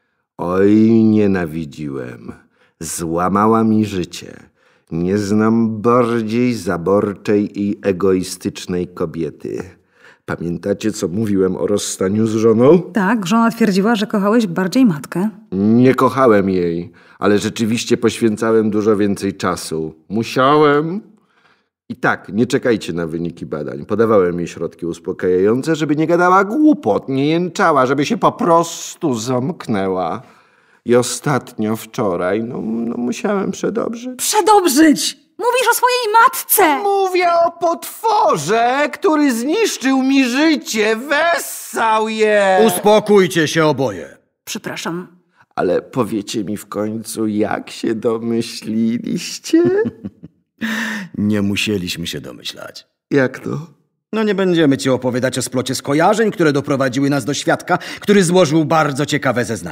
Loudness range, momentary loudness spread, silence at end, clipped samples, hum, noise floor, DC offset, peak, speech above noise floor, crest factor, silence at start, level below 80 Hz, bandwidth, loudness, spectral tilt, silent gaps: 6 LU; 13 LU; 0 s; under 0.1%; none; -57 dBFS; under 0.1%; 0 dBFS; 42 dB; 16 dB; 0.4 s; -56 dBFS; 16 kHz; -16 LUFS; -5 dB/octave; none